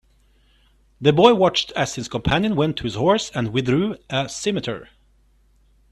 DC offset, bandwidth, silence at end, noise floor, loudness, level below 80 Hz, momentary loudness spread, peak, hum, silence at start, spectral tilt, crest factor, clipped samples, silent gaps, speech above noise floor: under 0.1%; 12.5 kHz; 1.05 s; -58 dBFS; -20 LUFS; -46 dBFS; 11 LU; 0 dBFS; none; 1 s; -5 dB/octave; 22 dB; under 0.1%; none; 38 dB